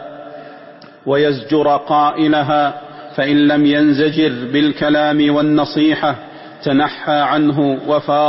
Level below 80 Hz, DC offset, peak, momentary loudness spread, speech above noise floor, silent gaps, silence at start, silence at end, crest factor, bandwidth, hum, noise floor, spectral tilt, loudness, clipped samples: -54 dBFS; under 0.1%; -4 dBFS; 15 LU; 25 dB; none; 0 s; 0 s; 10 dB; 5.8 kHz; none; -38 dBFS; -10 dB/octave; -15 LUFS; under 0.1%